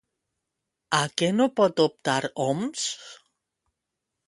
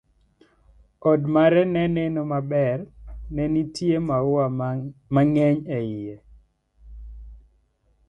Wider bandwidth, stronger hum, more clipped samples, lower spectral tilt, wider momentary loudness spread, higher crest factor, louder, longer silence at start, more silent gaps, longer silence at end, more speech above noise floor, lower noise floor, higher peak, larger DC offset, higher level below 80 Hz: about the same, 11.5 kHz vs 10.5 kHz; neither; neither; second, -4 dB/octave vs -8.5 dB/octave; second, 8 LU vs 17 LU; about the same, 22 dB vs 18 dB; about the same, -25 LUFS vs -23 LUFS; second, 0.9 s vs 1.05 s; neither; first, 1.1 s vs 0.7 s; first, 59 dB vs 42 dB; first, -84 dBFS vs -64 dBFS; about the same, -6 dBFS vs -6 dBFS; neither; second, -70 dBFS vs -46 dBFS